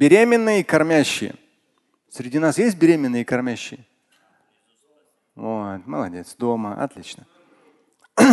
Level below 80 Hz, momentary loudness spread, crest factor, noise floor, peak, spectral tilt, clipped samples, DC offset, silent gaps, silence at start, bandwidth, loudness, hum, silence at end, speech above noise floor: -62 dBFS; 18 LU; 20 dB; -68 dBFS; 0 dBFS; -5 dB/octave; under 0.1%; under 0.1%; none; 0 s; 12.5 kHz; -20 LUFS; none; 0 s; 48 dB